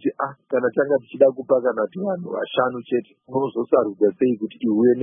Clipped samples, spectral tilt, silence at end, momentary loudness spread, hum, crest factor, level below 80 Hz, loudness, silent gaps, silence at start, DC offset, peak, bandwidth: under 0.1%; -11 dB/octave; 0 s; 8 LU; none; 18 dB; -70 dBFS; -22 LUFS; none; 0.05 s; under 0.1%; -2 dBFS; 3.7 kHz